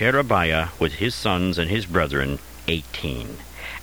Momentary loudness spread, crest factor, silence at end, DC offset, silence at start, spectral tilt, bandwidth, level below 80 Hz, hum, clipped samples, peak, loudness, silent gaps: 12 LU; 20 dB; 0 s; 0.4%; 0 s; -5.5 dB/octave; over 20 kHz; -38 dBFS; none; under 0.1%; -4 dBFS; -23 LUFS; none